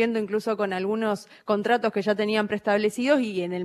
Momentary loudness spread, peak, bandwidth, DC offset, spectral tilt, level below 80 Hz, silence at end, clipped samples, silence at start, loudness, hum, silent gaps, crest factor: 5 LU; -8 dBFS; 13.5 kHz; under 0.1%; -5.5 dB/octave; -72 dBFS; 0 s; under 0.1%; 0 s; -25 LUFS; none; none; 16 dB